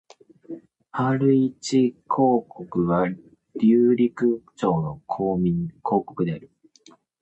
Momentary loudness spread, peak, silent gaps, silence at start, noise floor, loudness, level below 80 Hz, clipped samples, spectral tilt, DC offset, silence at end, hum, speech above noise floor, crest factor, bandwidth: 16 LU; -8 dBFS; none; 0.5 s; -55 dBFS; -23 LUFS; -56 dBFS; under 0.1%; -7.5 dB/octave; under 0.1%; 0.75 s; none; 33 dB; 16 dB; 8.4 kHz